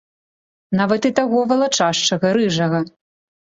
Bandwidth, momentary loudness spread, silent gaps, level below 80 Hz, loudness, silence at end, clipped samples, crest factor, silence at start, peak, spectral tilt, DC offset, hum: 8 kHz; 6 LU; none; -60 dBFS; -18 LUFS; 0.7 s; under 0.1%; 18 dB; 0.7 s; -2 dBFS; -4.5 dB/octave; under 0.1%; none